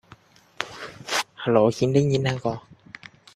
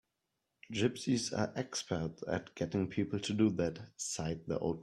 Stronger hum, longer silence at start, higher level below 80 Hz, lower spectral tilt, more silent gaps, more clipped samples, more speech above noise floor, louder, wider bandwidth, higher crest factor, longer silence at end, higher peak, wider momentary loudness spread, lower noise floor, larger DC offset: neither; about the same, 0.6 s vs 0.7 s; first, -58 dBFS vs -64 dBFS; about the same, -5.5 dB/octave vs -5 dB/octave; neither; neither; second, 31 dB vs 50 dB; first, -24 LUFS vs -36 LUFS; about the same, 14 kHz vs 13 kHz; about the same, 22 dB vs 18 dB; first, 0.75 s vs 0 s; first, -2 dBFS vs -18 dBFS; first, 23 LU vs 7 LU; second, -52 dBFS vs -85 dBFS; neither